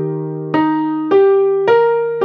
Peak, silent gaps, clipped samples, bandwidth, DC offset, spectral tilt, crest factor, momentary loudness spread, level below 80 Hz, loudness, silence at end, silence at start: -2 dBFS; none; under 0.1%; 5.2 kHz; under 0.1%; -9 dB/octave; 12 dB; 8 LU; -66 dBFS; -14 LUFS; 0 s; 0 s